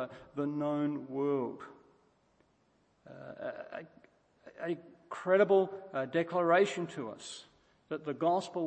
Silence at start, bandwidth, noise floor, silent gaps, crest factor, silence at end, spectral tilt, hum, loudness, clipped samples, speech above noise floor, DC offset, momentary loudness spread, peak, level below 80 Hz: 0 s; 8.8 kHz; -72 dBFS; none; 20 dB; 0 s; -6 dB/octave; none; -33 LUFS; under 0.1%; 39 dB; under 0.1%; 19 LU; -14 dBFS; -80 dBFS